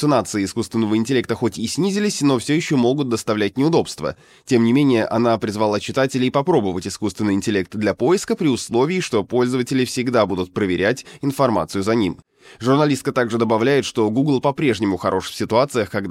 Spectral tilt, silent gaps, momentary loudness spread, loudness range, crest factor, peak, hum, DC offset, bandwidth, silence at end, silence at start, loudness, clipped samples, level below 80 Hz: -5.5 dB/octave; none; 6 LU; 1 LU; 16 dB; -2 dBFS; none; under 0.1%; 15.5 kHz; 0 s; 0 s; -19 LUFS; under 0.1%; -56 dBFS